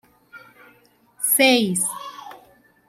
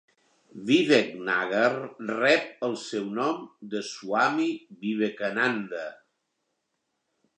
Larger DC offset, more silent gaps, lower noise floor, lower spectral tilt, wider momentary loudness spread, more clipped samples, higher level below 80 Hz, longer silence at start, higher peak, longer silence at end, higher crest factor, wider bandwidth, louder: neither; neither; second, -57 dBFS vs -79 dBFS; second, -2.5 dB/octave vs -4.5 dB/octave; first, 21 LU vs 13 LU; neither; first, -70 dBFS vs -82 dBFS; second, 0.35 s vs 0.55 s; about the same, -4 dBFS vs -6 dBFS; second, 0.5 s vs 1.45 s; about the same, 20 dB vs 22 dB; first, 16 kHz vs 9.8 kHz; first, -18 LUFS vs -26 LUFS